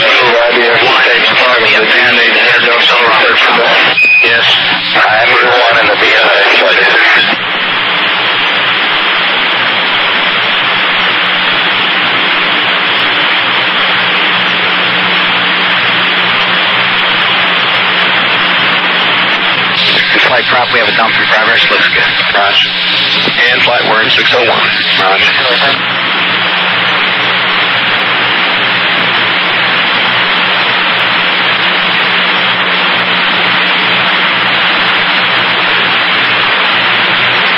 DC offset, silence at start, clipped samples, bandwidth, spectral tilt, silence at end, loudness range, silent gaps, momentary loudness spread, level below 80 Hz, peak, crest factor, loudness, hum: under 0.1%; 0 s; under 0.1%; 16 kHz; -3.5 dB/octave; 0 s; 3 LU; none; 3 LU; -50 dBFS; 0 dBFS; 8 dB; -7 LUFS; none